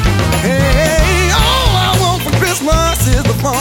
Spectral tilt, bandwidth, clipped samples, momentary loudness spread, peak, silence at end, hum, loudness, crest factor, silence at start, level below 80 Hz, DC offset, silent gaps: -4 dB/octave; 19.5 kHz; under 0.1%; 3 LU; 0 dBFS; 0 s; none; -12 LUFS; 12 dB; 0 s; -18 dBFS; under 0.1%; none